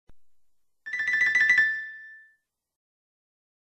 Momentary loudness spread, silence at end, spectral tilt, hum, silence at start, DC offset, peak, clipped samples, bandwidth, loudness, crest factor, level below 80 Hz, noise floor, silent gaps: 23 LU; 1.55 s; 0 dB/octave; none; 0.1 s; under 0.1%; -10 dBFS; under 0.1%; 9.2 kHz; -22 LUFS; 18 dB; -72 dBFS; -69 dBFS; none